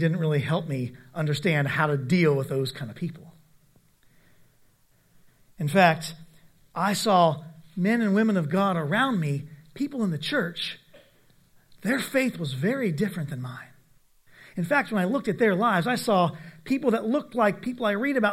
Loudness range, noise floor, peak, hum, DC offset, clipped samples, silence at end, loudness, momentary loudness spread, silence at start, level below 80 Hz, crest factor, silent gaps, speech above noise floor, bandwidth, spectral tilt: 5 LU; -62 dBFS; -4 dBFS; none; under 0.1%; under 0.1%; 0 s; -25 LUFS; 13 LU; 0 s; -66 dBFS; 24 dB; none; 37 dB; 16 kHz; -6 dB/octave